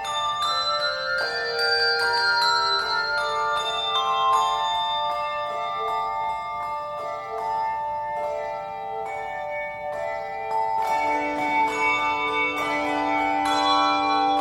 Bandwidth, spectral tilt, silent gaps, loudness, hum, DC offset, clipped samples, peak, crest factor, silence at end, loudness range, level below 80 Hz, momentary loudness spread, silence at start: 16 kHz; -2 dB/octave; none; -24 LUFS; none; under 0.1%; under 0.1%; -8 dBFS; 16 dB; 0 s; 7 LU; -58 dBFS; 10 LU; 0 s